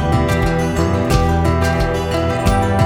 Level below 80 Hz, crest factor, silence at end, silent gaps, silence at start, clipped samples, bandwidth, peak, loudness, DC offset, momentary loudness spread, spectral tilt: -24 dBFS; 14 dB; 0 s; none; 0 s; under 0.1%; 16.5 kHz; 0 dBFS; -16 LUFS; under 0.1%; 3 LU; -6.5 dB/octave